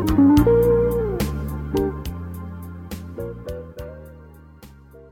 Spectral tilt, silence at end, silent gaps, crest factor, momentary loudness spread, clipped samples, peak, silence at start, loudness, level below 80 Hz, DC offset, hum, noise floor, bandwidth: -8 dB/octave; 0.05 s; none; 16 dB; 21 LU; under 0.1%; -4 dBFS; 0 s; -20 LUFS; -34 dBFS; under 0.1%; none; -45 dBFS; 18 kHz